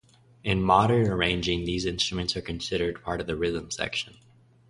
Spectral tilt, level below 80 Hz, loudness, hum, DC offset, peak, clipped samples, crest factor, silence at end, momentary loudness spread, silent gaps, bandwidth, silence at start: -5 dB/octave; -44 dBFS; -26 LUFS; none; under 0.1%; -6 dBFS; under 0.1%; 22 dB; 0.6 s; 11 LU; none; 11.5 kHz; 0.45 s